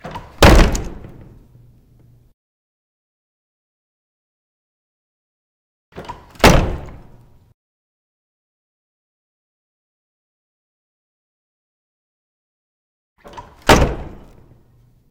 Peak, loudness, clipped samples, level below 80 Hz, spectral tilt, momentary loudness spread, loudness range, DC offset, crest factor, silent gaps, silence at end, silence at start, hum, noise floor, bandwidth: 0 dBFS; -14 LUFS; under 0.1%; -26 dBFS; -5 dB/octave; 27 LU; 9 LU; under 0.1%; 22 dB; 2.34-5.92 s, 7.54-13.16 s; 1.05 s; 0.05 s; none; -52 dBFS; 17.5 kHz